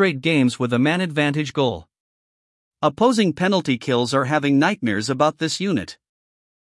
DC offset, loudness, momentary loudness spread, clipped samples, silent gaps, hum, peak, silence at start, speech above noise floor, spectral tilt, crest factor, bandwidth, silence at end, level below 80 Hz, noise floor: under 0.1%; -20 LUFS; 6 LU; under 0.1%; 2.00-2.71 s; none; -2 dBFS; 0 s; over 70 dB; -5.5 dB/octave; 18 dB; 12 kHz; 0.85 s; -62 dBFS; under -90 dBFS